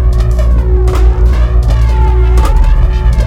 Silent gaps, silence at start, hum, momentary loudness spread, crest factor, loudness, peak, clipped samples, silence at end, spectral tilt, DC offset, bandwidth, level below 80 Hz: none; 0 s; none; 2 LU; 8 dB; -11 LUFS; 0 dBFS; 0.2%; 0 s; -7.5 dB/octave; under 0.1%; 8.6 kHz; -8 dBFS